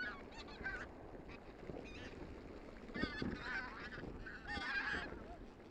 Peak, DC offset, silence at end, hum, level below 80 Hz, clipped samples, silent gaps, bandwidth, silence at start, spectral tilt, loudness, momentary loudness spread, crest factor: -24 dBFS; under 0.1%; 0 s; none; -58 dBFS; under 0.1%; none; 11.5 kHz; 0 s; -5 dB/octave; -47 LUFS; 13 LU; 24 dB